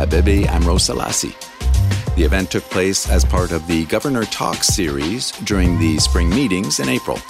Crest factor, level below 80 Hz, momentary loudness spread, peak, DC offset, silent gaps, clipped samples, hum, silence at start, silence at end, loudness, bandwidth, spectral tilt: 12 dB; -20 dBFS; 5 LU; -4 dBFS; under 0.1%; none; under 0.1%; none; 0 s; 0 s; -17 LUFS; 16 kHz; -4.5 dB/octave